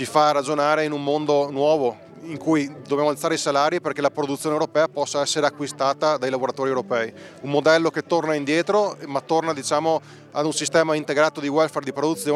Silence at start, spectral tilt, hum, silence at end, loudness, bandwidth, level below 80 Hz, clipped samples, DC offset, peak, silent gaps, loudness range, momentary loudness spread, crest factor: 0 s; -4 dB/octave; none; 0 s; -22 LUFS; 14 kHz; -76 dBFS; under 0.1%; under 0.1%; -4 dBFS; none; 1 LU; 6 LU; 18 dB